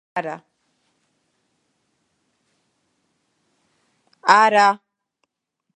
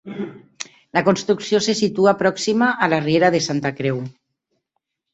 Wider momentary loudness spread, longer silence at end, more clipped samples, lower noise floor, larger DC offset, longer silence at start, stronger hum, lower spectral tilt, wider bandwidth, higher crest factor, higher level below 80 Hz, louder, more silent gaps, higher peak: first, 19 LU vs 16 LU; about the same, 1 s vs 1.05 s; neither; about the same, -78 dBFS vs -77 dBFS; neither; about the same, 0.15 s vs 0.05 s; neither; second, -3 dB/octave vs -5 dB/octave; first, 10.5 kHz vs 8.2 kHz; first, 24 dB vs 18 dB; second, -84 dBFS vs -60 dBFS; about the same, -17 LUFS vs -19 LUFS; neither; about the same, 0 dBFS vs -2 dBFS